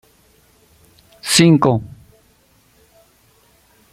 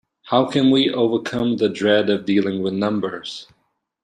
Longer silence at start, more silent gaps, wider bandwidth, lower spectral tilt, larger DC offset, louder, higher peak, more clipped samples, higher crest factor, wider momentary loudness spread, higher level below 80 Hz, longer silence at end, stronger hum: first, 1.25 s vs 0.25 s; neither; first, 14.5 kHz vs 9.8 kHz; second, -4.5 dB/octave vs -6 dB/octave; neither; first, -14 LUFS vs -19 LUFS; about the same, 0 dBFS vs -2 dBFS; neither; about the same, 20 dB vs 18 dB; first, 20 LU vs 10 LU; first, -54 dBFS vs -60 dBFS; first, 2.05 s vs 0.6 s; neither